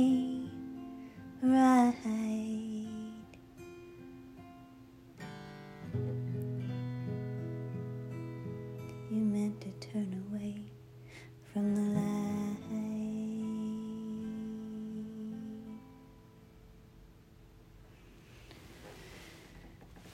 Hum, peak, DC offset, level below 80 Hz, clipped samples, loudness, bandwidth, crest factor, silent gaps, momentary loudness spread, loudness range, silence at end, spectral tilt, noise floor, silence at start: none; -16 dBFS; under 0.1%; -66 dBFS; under 0.1%; -36 LUFS; 15.5 kHz; 20 dB; none; 22 LU; 21 LU; 0 s; -7.5 dB/octave; -58 dBFS; 0 s